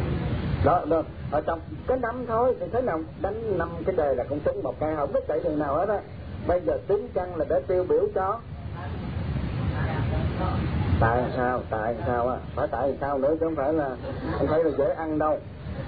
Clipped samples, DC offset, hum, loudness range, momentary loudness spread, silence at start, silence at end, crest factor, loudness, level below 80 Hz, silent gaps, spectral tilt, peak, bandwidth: under 0.1%; 0.2%; none; 1 LU; 7 LU; 0 s; 0 s; 16 dB; -27 LUFS; -40 dBFS; none; -11 dB/octave; -10 dBFS; 5 kHz